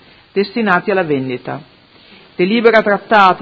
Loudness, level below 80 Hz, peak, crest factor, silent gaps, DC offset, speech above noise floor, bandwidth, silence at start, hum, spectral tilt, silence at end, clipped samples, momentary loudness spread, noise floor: -14 LUFS; -58 dBFS; 0 dBFS; 14 dB; none; under 0.1%; 31 dB; 7.4 kHz; 0.35 s; none; -7 dB/octave; 0 s; 0.1%; 16 LU; -44 dBFS